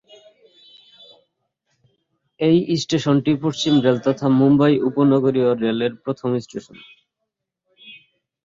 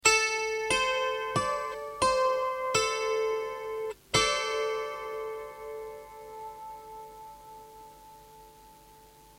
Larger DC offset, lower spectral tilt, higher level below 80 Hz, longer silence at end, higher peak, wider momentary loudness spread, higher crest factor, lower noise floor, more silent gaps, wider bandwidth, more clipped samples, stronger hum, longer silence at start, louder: neither; first, -6.5 dB/octave vs -1.5 dB/octave; about the same, -60 dBFS vs -58 dBFS; first, 0.5 s vs 0.3 s; first, -2 dBFS vs -6 dBFS; second, 9 LU vs 21 LU; second, 18 dB vs 26 dB; first, -80 dBFS vs -55 dBFS; neither; second, 7.6 kHz vs 16.5 kHz; neither; neither; first, 2.4 s vs 0.05 s; first, -18 LUFS vs -29 LUFS